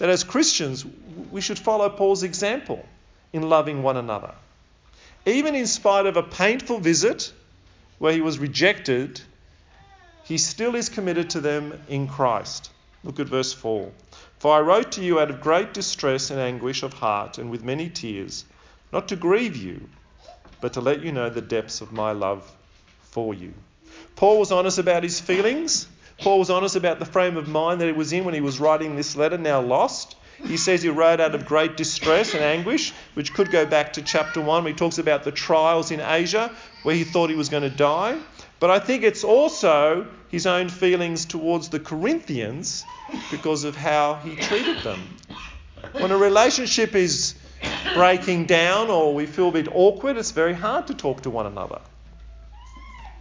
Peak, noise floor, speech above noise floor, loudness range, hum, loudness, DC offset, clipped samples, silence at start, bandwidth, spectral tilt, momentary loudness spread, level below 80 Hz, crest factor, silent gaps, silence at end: -4 dBFS; -54 dBFS; 33 dB; 7 LU; none; -22 LUFS; under 0.1%; under 0.1%; 0 s; 7.6 kHz; -4 dB/octave; 14 LU; -52 dBFS; 20 dB; none; 0 s